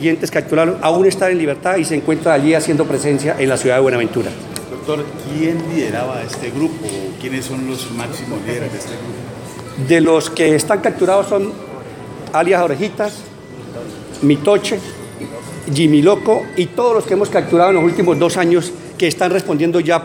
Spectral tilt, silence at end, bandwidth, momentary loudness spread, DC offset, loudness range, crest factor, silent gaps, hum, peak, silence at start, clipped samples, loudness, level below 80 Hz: -5.5 dB/octave; 0 s; 17 kHz; 16 LU; under 0.1%; 7 LU; 16 dB; none; none; 0 dBFS; 0 s; under 0.1%; -16 LUFS; -52 dBFS